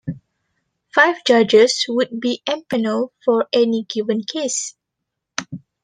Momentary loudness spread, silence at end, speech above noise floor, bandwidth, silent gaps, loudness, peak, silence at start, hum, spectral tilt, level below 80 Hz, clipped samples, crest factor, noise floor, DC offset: 16 LU; 0.25 s; 62 dB; 10 kHz; none; -18 LUFS; -2 dBFS; 0.05 s; none; -3 dB/octave; -64 dBFS; under 0.1%; 18 dB; -80 dBFS; under 0.1%